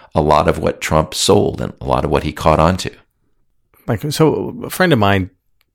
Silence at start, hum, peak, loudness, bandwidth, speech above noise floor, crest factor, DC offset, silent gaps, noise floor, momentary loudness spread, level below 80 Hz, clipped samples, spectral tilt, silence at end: 0.15 s; none; 0 dBFS; -16 LUFS; 18.5 kHz; 46 dB; 16 dB; under 0.1%; none; -61 dBFS; 11 LU; -34 dBFS; under 0.1%; -5 dB/octave; 0.45 s